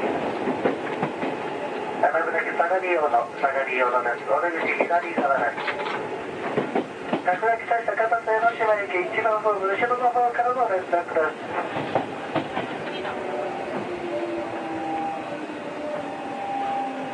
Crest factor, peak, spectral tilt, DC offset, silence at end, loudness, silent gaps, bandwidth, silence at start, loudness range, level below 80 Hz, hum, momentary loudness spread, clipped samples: 20 dB; -4 dBFS; -5.5 dB/octave; under 0.1%; 0 s; -25 LUFS; none; 10.5 kHz; 0 s; 7 LU; -68 dBFS; none; 8 LU; under 0.1%